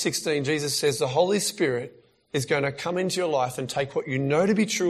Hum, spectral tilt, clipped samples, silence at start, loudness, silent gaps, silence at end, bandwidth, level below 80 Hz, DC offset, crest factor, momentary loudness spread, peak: none; -4 dB/octave; under 0.1%; 0 s; -25 LUFS; none; 0 s; 15 kHz; -64 dBFS; under 0.1%; 18 dB; 6 LU; -8 dBFS